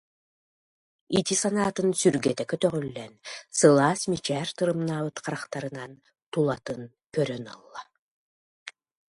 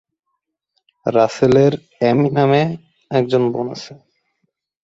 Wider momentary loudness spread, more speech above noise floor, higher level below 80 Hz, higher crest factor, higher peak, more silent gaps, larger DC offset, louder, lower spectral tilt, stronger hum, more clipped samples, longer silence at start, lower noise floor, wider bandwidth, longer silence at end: first, 21 LU vs 13 LU; first, over 64 dB vs 59 dB; second, -64 dBFS vs -54 dBFS; first, 22 dB vs 16 dB; about the same, -4 dBFS vs -2 dBFS; first, 6.26-6.32 s, 8.01-8.66 s vs none; neither; second, -26 LUFS vs -17 LUFS; second, -4.5 dB/octave vs -7.5 dB/octave; neither; neither; about the same, 1.1 s vs 1.05 s; first, under -90 dBFS vs -75 dBFS; first, 11.5 kHz vs 8 kHz; second, 0.4 s vs 0.9 s